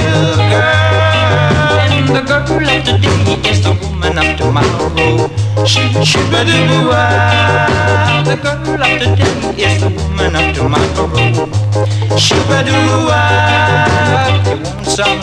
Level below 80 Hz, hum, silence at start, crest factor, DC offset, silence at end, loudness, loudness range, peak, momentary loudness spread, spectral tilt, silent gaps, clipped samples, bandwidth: -28 dBFS; none; 0 s; 10 dB; under 0.1%; 0 s; -11 LUFS; 2 LU; 0 dBFS; 4 LU; -5 dB/octave; none; under 0.1%; 11 kHz